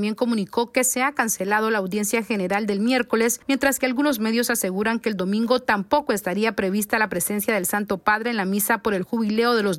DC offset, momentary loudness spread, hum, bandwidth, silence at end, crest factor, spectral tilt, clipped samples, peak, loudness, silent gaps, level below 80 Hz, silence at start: under 0.1%; 3 LU; none; 16.5 kHz; 0 s; 18 dB; -3.5 dB/octave; under 0.1%; -4 dBFS; -22 LUFS; none; -58 dBFS; 0 s